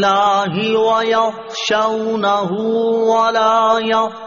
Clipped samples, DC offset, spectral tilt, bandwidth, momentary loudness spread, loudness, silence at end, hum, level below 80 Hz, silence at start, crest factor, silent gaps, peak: under 0.1%; under 0.1%; -2.5 dB/octave; 7.2 kHz; 4 LU; -15 LUFS; 0 s; none; -60 dBFS; 0 s; 12 dB; none; -2 dBFS